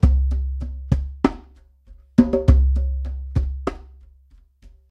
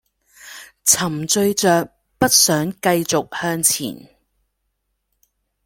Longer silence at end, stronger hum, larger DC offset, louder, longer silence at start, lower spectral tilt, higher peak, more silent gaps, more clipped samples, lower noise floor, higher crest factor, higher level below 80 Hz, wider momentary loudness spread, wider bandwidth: second, 0.25 s vs 1.65 s; neither; neither; second, -22 LUFS vs -17 LUFS; second, 0 s vs 0.45 s; first, -9.5 dB/octave vs -2.5 dB/octave; about the same, 0 dBFS vs 0 dBFS; neither; neither; second, -52 dBFS vs -73 dBFS; about the same, 20 dB vs 20 dB; first, -22 dBFS vs -56 dBFS; second, 14 LU vs 18 LU; second, 6 kHz vs 17 kHz